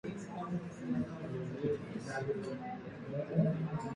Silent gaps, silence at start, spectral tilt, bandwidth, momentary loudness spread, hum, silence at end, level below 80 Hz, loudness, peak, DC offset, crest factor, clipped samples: none; 0.05 s; -8 dB/octave; 10.5 kHz; 10 LU; none; 0 s; -66 dBFS; -39 LUFS; -18 dBFS; under 0.1%; 20 dB; under 0.1%